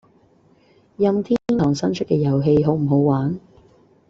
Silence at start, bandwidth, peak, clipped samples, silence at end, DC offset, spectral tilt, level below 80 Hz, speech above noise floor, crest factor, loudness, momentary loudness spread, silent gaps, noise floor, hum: 1 s; 7.6 kHz; -4 dBFS; under 0.1%; 0.7 s; under 0.1%; -8.5 dB/octave; -52 dBFS; 37 dB; 16 dB; -19 LUFS; 5 LU; none; -56 dBFS; none